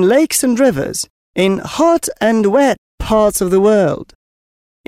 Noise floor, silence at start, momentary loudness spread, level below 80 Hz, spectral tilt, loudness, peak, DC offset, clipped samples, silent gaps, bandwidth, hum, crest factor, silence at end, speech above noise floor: under -90 dBFS; 0 s; 10 LU; -38 dBFS; -4.5 dB/octave; -14 LUFS; -2 dBFS; under 0.1%; under 0.1%; 1.10-1.34 s, 2.78-2.98 s; 16 kHz; none; 12 dB; 0.85 s; over 77 dB